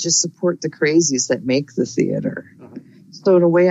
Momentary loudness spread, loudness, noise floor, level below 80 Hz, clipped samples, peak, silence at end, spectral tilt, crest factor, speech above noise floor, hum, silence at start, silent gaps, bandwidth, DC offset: 9 LU; -18 LUFS; -39 dBFS; -64 dBFS; under 0.1%; -4 dBFS; 0 s; -4 dB/octave; 14 dB; 22 dB; none; 0 s; none; 8 kHz; under 0.1%